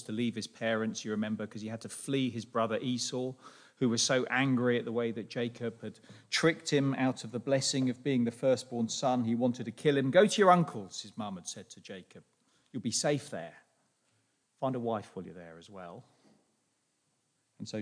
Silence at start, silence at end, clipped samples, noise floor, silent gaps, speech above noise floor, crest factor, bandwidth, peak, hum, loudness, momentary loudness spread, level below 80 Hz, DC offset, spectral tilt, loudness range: 0 s; 0 s; under 0.1%; -77 dBFS; none; 45 dB; 22 dB; 10.5 kHz; -10 dBFS; none; -31 LUFS; 19 LU; -82 dBFS; under 0.1%; -4.5 dB/octave; 13 LU